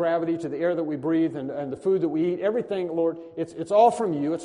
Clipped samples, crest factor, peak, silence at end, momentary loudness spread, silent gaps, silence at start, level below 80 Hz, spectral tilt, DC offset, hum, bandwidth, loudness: under 0.1%; 18 dB; -6 dBFS; 0 s; 12 LU; none; 0 s; -68 dBFS; -7 dB/octave; under 0.1%; none; 10.5 kHz; -25 LUFS